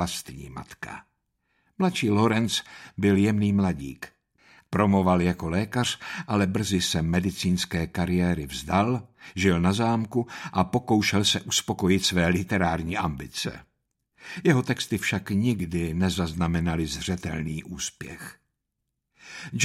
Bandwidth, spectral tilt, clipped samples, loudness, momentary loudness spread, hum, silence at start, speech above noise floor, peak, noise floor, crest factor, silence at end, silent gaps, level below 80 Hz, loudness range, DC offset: 15.5 kHz; -5 dB/octave; under 0.1%; -25 LUFS; 16 LU; none; 0 s; 56 dB; -6 dBFS; -81 dBFS; 20 dB; 0 s; none; -48 dBFS; 4 LU; under 0.1%